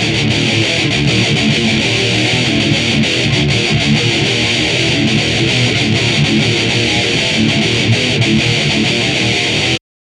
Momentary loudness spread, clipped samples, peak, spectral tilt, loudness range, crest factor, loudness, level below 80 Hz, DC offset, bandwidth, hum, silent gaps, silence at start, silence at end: 1 LU; under 0.1%; 0 dBFS; -4 dB/octave; 0 LU; 12 dB; -12 LUFS; -36 dBFS; under 0.1%; 12 kHz; none; none; 0 s; 0.3 s